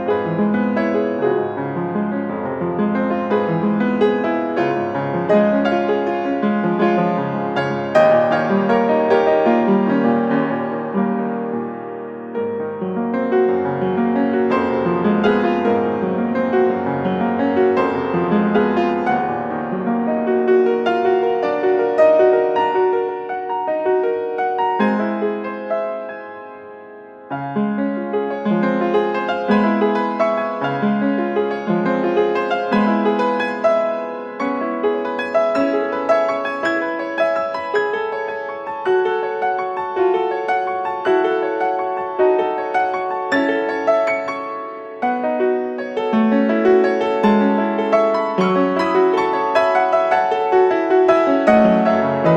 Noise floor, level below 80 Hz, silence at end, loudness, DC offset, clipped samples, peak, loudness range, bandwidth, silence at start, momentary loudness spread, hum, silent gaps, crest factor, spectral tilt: -38 dBFS; -60 dBFS; 0 s; -18 LUFS; under 0.1%; under 0.1%; -2 dBFS; 5 LU; 7.8 kHz; 0 s; 8 LU; none; none; 16 dB; -7.5 dB/octave